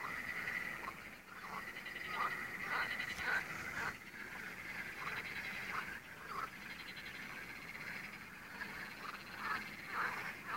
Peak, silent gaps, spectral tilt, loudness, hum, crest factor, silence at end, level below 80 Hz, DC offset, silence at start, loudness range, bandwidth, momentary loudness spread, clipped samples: -26 dBFS; none; -3 dB/octave; -43 LUFS; none; 18 dB; 0 s; -70 dBFS; under 0.1%; 0 s; 5 LU; 16 kHz; 9 LU; under 0.1%